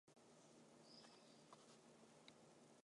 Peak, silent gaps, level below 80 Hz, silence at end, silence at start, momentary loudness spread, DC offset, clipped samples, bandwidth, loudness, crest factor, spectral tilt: -48 dBFS; none; under -90 dBFS; 0 s; 0.05 s; 4 LU; under 0.1%; under 0.1%; 11 kHz; -67 LUFS; 20 dB; -3.5 dB/octave